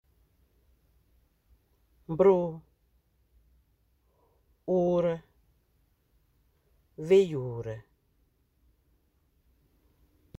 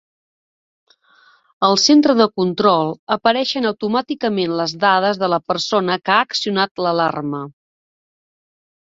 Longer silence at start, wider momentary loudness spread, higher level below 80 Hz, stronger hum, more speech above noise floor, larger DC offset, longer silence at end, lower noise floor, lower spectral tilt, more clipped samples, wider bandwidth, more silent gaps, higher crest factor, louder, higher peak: first, 2.1 s vs 1.6 s; first, 19 LU vs 8 LU; about the same, -64 dBFS vs -62 dBFS; neither; first, 45 dB vs 37 dB; neither; first, 2.6 s vs 1.3 s; first, -70 dBFS vs -53 dBFS; first, -8 dB/octave vs -4 dB/octave; neither; about the same, 8.2 kHz vs 7.8 kHz; second, none vs 2.99-3.07 s, 6.71-6.75 s; about the same, 22 dB vs 18 dB; second, -27 LUFS vs -17 LUFS; second, -10 dBFS vs 0 dBFS